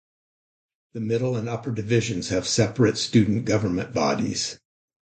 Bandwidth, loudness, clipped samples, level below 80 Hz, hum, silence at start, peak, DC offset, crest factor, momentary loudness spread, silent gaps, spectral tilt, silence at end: 9.2 kHz; -24 LUFS; under 0.1%; -52 dBFS; none; 0.95 s; -6 dBFS; under 0.1%; 18 dB; 9 LU; none; -5 dB/octave; 0.6 s